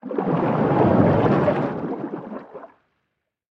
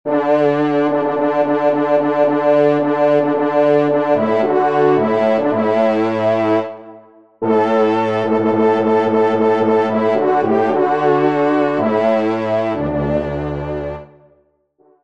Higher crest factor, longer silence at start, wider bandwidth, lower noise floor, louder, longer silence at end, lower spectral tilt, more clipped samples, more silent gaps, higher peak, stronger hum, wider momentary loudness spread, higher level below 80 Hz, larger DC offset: first, 18 dB vs 12 dB; about the same, 0.05 s vs 0.05 s; second, 6.4 kHz vs 7.4 kHz; first, -77 dBFS vs -57 dBFS; second, -20 LUFS vs -15 LUFS; second, 0.85 s vs 1 s; first, -10 dB/octave vs -8 dB/octave; neither; neither; about the same, -4 dBFS vs -2 dBFS; neither; first, 18 LU vs 5 LU; about the same, -50 dBFS vs -46 dBFS; second, under 0.1% vs 0.4%